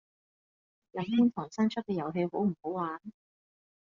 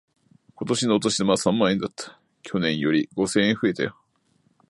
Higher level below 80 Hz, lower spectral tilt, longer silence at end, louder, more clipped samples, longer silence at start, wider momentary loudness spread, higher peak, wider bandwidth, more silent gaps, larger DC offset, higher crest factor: second, -74 dBFS vs -60 dBFS; first, -6.5 dB/octave vs -4.5 dB/octave; about the same, 0.8 s vs 0.8 s; second, -31 LUFS vs -23 LUFS; neither; first, 0.95 s vs 0.6 s; first, 14 LU vs 11 LU; second, -16 dBFS vs -4 dBFS; second, 7.4 kHz vs 11.5 kHz; neither; neither; about the same, 18 dB vs 20 dB